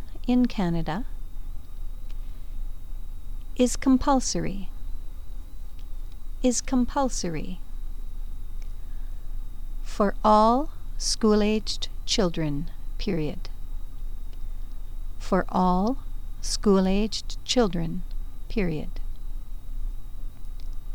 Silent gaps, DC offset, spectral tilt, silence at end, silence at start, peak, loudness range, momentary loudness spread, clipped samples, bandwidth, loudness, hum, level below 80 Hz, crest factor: none; 2%; -5 dB/octave; 0 s; 0 s; -8 dBFS; 8 LU; 21 LU; under 0.1%; 17.5 kHz; -25 LUFS; none; -32 dBFS; 20 dB